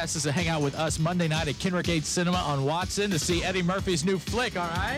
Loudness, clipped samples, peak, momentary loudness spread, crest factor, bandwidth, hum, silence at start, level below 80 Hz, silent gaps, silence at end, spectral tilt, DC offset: -27 LUFS; under 0.1%; -16 dBFS; 2 LU; 12 dB; 16 kHz; none; 0 s; -44 dBFS; none; 0 s; -4.5 dB/octave; under 0.1%